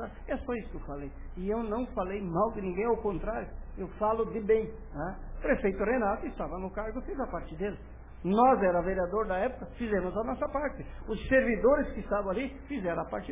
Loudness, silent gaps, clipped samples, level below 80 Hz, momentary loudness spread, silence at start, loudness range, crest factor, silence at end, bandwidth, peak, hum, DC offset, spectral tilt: -31 LUFS; none; under 0.1%; -44 dBFS; 13 LU; 0 s; 4 LU; 18 dB; 0 s; 3.8 kHz; -14 dBFS; none; under 0.1%; -6 dB/octave